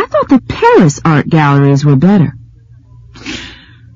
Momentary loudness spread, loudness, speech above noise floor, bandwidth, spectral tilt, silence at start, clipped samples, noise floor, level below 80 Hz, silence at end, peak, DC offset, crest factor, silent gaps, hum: 17 LU; -9 LUFS; 31 dB; 7.6 kHz; -7 dB/octave; 0 s; 0.2%; -39 dBFS; -38 dBFS; 0.4 s; 0 dBFS; under 0.1%; 10 dB; none; none